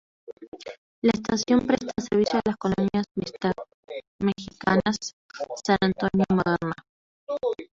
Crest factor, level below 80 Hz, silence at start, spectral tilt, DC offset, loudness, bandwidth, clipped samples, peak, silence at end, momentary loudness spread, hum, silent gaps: 20 dB; -54 dBFS; 0.3 s; -5.5 dB/octave; under 0.1%; -25 LUFS; 7.8 kHz; under 0.1%; -6 dBFS; 0.05 s; 17 LU; none; 0.33-0.37 s, 0.48-0.52 s, 0.78-1.02 s, 3.11-3.15 s, 3.74-3.83 s, 4.07-4.19 s, 5.13-5.29 s, 6.89-7.27 s